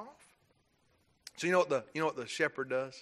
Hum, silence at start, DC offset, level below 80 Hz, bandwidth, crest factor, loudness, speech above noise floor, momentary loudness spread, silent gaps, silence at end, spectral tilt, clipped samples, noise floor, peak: none; 0 s; under 0.1%; -80 dBFS; 12.5 kHz; 20 dB; -33 LUFS; 39 dB; 22 LU; none; 0 s; -4.5 dB/octave; under 0.1%; -72 dBFS; -16 dBFS